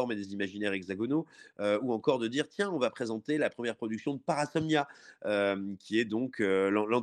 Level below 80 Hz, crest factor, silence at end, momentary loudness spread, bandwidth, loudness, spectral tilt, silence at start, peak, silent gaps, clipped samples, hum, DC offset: -78 dBFS; 18 dB; 0 s; 7 LU; 10.5 kHz; -32 LUFS; -5.5 dB/octave; 0 s; -12 dBFS; none; under 0.1%; none; under 0.1%